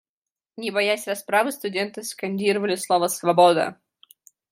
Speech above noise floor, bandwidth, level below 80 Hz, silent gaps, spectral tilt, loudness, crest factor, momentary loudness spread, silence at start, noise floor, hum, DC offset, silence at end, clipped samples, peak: over 68 dB; 16 kHz; -78 dBFS; none; -3.5 dB/octave; -22 LUFS; 20 dB; 12 LU; 0.6 s; under -90 dBFS; none; under 0.1%; 0.8 s; under 0.1%; -4 dBFS